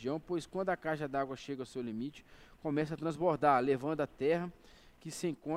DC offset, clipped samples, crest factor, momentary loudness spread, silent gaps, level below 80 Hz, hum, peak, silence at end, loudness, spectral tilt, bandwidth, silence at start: under 0.1%; under 0.1%; 20 dB; 13 LU; none; -66 dBFS; none; -14 dBFS; 0 s; -35 LUFS; -6 dB/octave; 16 kHz; 0 s